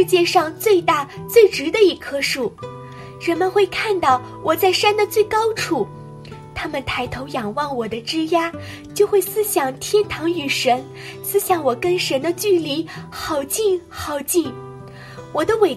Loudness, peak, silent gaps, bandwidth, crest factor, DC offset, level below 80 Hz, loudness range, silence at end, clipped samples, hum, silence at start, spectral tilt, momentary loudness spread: -19 LUFS; 0 dBFS; none; 15.5 kHz; 18 dB; under 0.1%; -50 dBFS; 4 LU; 0 s; under 0.1%; none; 0 s; -3.5 dB/octave; 15 LU